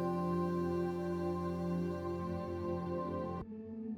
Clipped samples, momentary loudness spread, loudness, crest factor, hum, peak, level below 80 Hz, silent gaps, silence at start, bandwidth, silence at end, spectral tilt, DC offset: under 0.1%; 6 LU; -38 LUFS; 12 dB; none; -24 dBFS; -60 dBFS; none; 0 s; 10.5 kHz; 0 s; -9 dB/octave; under 0.1%